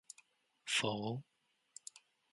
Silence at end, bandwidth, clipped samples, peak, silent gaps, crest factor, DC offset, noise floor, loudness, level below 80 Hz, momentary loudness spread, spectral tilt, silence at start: 0.35 s; 11.5 kHz; under 0.1%; -22 dBFS; none; 22 dB; under 0.1%; -71 dBFS; -38 LUFS; -80 dBFS; 22 LU; -3 dB/octave; 0.65 s